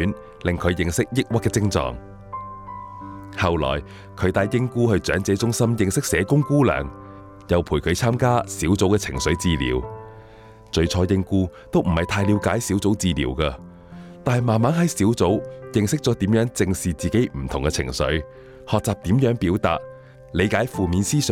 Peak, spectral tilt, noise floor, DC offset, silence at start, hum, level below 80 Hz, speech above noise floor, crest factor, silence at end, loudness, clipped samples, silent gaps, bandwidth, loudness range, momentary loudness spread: -6 dBFS; -5.5 dB/octave; -45 dBFS; under 0.1%; 0 s; none; -38 dBFS; 24 dB; 16 dB; 0 s; -22 LUFS; under 0.1%; none; 17 kHz; 3 LU; 16 LU